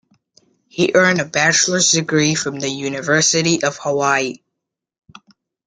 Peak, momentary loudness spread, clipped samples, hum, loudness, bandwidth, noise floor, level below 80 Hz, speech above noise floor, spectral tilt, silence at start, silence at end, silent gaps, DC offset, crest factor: -2 dBFS; 9 LU; under 0.1%; none; -16 LUFS; 11 kHz; -81 dBFS; -60 dBFS; 64 dB; -3 dB/octave; 0.75 s; 1.3 s; none; under 0.1%; 18 dB